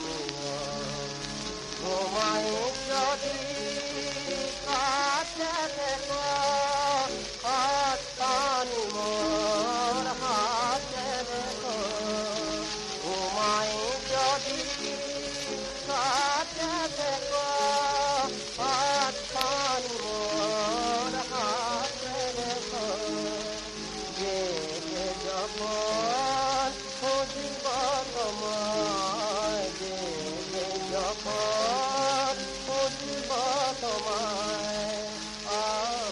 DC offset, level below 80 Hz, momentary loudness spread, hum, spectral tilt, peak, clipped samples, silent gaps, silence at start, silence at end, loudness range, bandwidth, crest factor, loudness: under 0.1%; -54 dBFS; 7 LU; none; -2 dB/octave; -8 dBFS; under 0.1%; none; 0 s; 0 s; 3 LU; 11.5 kHz; 22 dB; -29 LUFS